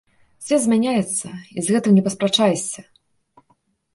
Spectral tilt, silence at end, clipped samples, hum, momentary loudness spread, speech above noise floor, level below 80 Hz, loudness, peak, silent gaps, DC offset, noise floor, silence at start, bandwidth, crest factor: -4.5 dB/octave; 1.15 s; under 0.1%; none; 14 LU; 45 dB; -64 dBFS; -19 LUFS; -4 dBFS; none; under 0.1%; -64 dBFS; 0.4 s; 11.5 kHz; 16 dB